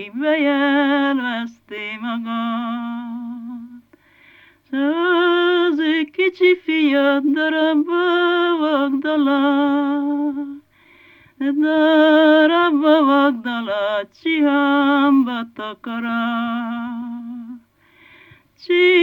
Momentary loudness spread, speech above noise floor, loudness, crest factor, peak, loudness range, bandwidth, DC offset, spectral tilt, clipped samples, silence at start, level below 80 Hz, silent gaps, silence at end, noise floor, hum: 15 LU; 35 dB; -17 LUFS; 14 dB; -4 dBFS; 9 LU; 5.6 kHz; under 0.1%; -5.5 dB/octave; under 0.1%; 0 s; -72 dBFS; none; 0 s; -52 dBFS; none